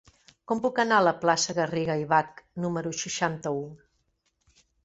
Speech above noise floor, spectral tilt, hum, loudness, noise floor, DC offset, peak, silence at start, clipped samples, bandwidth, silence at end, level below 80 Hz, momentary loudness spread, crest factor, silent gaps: 47 dB; -4 dB/octave; none; -26 LUFS; -74 dBFS; under 0.1%; -8 dBFS; 0.5 s; under 0.1%; 8.2 kHz; 1.1 s; -66 dBFS; 11 LU; 20 dB; none